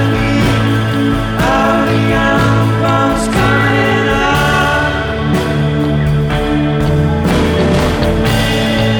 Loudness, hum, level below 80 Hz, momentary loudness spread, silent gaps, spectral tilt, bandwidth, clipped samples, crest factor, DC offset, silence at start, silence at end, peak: -12 LUFS; none; -24 dBFS; 3 LU; none; -6 dB/octave; 19.5 kHz; under 0.1%; 10 dB; under 0.1%; 0 s; 0 s; -2 dBFS